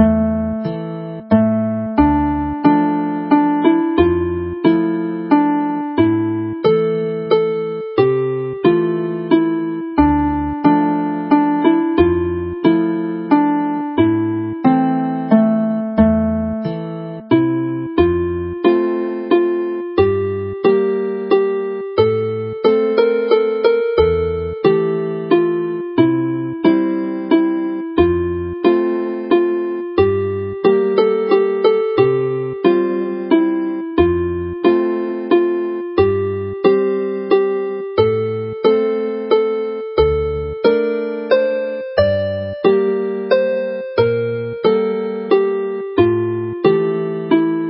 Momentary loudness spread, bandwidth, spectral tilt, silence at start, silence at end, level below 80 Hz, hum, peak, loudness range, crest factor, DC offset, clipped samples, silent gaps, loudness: 7 LU; 5.6 kHz; -12.5 dB/octave; 0 s; 0 s; -36 dBFS; none; 0 dBFS; 2 LU; 16 dB; under 0.1%; under 0.1%; none; -17 LUFS